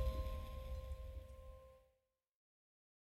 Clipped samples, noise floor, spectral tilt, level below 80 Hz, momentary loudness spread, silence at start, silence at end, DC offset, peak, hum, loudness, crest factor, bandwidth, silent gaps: under 0.1%; -84 dBFS; -6.5 dB/octave; -50 dBFS; 15 LU; 0 s; 1.3 s; under 0.1%; -30 dBFS; none; -50 LUFS; 18 dB; 15.5 kHz; none